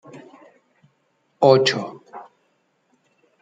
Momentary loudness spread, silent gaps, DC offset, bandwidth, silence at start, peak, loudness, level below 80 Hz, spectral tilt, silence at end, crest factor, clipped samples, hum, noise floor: 27 LU; none; under 0.1%; 9 kHz; 0.15 s; -2 dBFS; -17 LUFS; -70 dBFS; -5 dB/octave; 1.2 s; 22 dB; under 0.1%; none; -67 dBFS